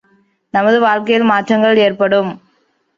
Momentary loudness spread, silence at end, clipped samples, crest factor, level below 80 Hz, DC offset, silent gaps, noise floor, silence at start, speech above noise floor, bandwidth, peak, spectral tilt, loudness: 5 LU; 0.6 s; under 0.1%; 12 dB; -60 dBFS; under 0.1%; none; -60 dBFS; 0.55 s; 48 dB; 7.4 kHz; -2 dBFS; -6 dB/octave; -13 LUFS